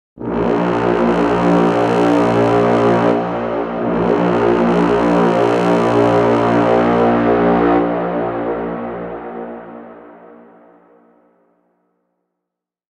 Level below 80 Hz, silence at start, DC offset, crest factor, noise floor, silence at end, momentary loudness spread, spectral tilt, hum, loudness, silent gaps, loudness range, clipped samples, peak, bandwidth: -42 dBFS; 0.15 s; under 0.1%; 14 dB; -81 dBFS; 2.8 s; 12 LU; -7.5 dB/octave; none; -15 LUFS; none; 14 LU; under 0.1%; -2 dBFS; 10 kHz